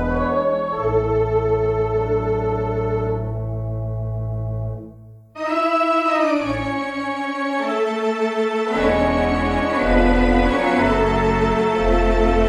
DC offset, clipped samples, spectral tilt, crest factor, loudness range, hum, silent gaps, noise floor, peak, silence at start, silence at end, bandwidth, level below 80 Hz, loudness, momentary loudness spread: under 0.1%; under 0.1%; -7 dB/octave; 16 dB; 6 LU; none; none; -42 dBFS; -4 dBFS; 0 s; 0 s; 10.5 kHz; -28 dBFS; -20 LUFS; 9 LU